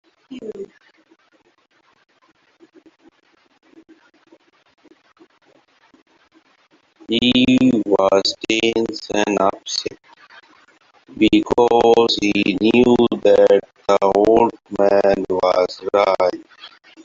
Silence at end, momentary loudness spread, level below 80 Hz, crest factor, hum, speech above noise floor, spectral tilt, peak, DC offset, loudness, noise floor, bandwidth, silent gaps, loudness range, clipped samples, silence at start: 0.4 s; 10 LU; -52 dBFS; 16 dB; none; 44 dB; -4.5 dB/octave; -2 dBFS; under 0.1%; -16 LUFS; -59 dBFS; 7.6 kHz; 6.02-6.06 s; 6 LU; under 0.1%; 0.3 s